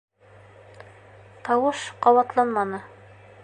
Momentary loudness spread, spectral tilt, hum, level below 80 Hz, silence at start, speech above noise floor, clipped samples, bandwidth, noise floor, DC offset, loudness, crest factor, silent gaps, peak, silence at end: 14 LU; -5 dB/octave; none; -66 dBFS; 1.45 s; 29 dB; under 0.1%; 9.6 kHz; -51 dBFS; under 0.1%; -22 LUFS; 20 dB; none; -4 dBFS; 0.6 s